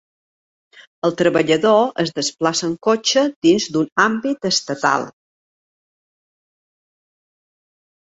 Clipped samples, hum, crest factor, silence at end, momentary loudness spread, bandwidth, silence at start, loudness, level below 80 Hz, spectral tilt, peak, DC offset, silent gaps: under 0.1%; none; 20 dB; 3 s; 6 LU; 8 kHz; 1.05 s; -18 LUFS; -62 dBFS; -3.5 dB/octave; -2 dBFS; under 0.1%; 3.36-3.42 s, 3.92-3.96 s